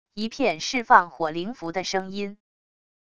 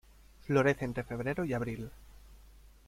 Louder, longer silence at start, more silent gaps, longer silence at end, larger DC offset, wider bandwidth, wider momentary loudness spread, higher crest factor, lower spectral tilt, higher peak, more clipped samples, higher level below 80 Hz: first, -24 LUFS vs -33 LUFS; second, 0.05 s vs 0.45 s; neither; first, 0.7 s vs 0.3 s; first, 0.4% vs under 0.1%; second, 11 kHz vs 16 kHz; about the same, 15 LU vs 16 LU; about the same, 26 dB vs 22 dB; second, -3.5 dB/octave vs -7 dB/octave; first, 0 dBFS vs -14 dBFS; neither; second, -62 dBFS vs -54 dBFS